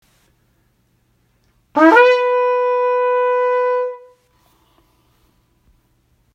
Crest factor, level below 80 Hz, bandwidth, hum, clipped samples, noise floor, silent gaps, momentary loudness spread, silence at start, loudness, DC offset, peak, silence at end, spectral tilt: 18 dB; -64 dBFS; 7.4 kHz; none; under 0.1%; -61 dBFS; none; 13 LU; 1.75 s; -15 LUFS; under 0.1%; 0 dBFS; 2.35 s; -4 dB/octave